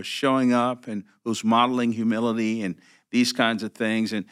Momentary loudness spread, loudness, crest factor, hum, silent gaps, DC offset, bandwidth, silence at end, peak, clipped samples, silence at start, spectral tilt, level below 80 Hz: 12 LU; -24 LUFS; 20 dB; none; none; under 0.1%; 14.5 kHz; 0.1 s; -4 dBFS; under 0.1%; 0 s; -4.5 dB/octave; -84 dBFS